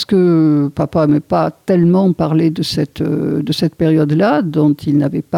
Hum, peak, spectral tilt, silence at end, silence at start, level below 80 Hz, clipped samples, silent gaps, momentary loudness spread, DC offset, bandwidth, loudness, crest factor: none; -4 dBFS; -7.5 dB/octave; 0 s; 0 s; -46 dBFS; under 0.1%; none; 6 LU; under 0.1%; 15 kHz; -14 LUFS; 10 dB